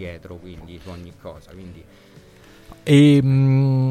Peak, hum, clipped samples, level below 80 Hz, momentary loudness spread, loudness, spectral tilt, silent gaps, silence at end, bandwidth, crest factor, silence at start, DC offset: -2 dBFS; none; under 0.1%; -50 dBFS; 26 LU; -15 LUFS; -8 dB/octave; none; 0 s; 9.4 kHz; 18 dB; 0 s; under 0.1%